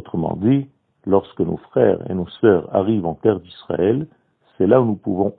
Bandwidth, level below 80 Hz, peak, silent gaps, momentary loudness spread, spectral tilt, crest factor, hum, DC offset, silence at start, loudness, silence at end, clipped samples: 4.4 kHz; -52 dBFS; 0 dBFS; none; 11 LU; -12.5 dB/octave; 18 dB; none; under 0.1%; 0.05 s; -19 LUFS; 0.1 s; under 0.1%